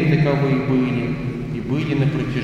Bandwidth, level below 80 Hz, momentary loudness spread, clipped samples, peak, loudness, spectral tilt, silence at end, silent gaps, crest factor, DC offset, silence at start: 7.4 kHz; -40 dBFS; 8 LU; under 0.1%; -6 dBFS; -20 LUFS; -8.5 dB/octave; 0 s; none; 14 dB; under 0.1%; 0 s